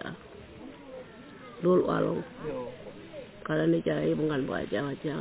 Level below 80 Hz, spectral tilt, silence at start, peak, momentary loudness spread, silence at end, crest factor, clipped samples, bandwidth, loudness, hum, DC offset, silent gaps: -58 dBFS; -6.5 dB/octave; 0 s; -14 dBFS; 21 LU; 0 s; 16 dB; under 0.1%; 4 kHz; -29 LUFS; none; under 0.1%; none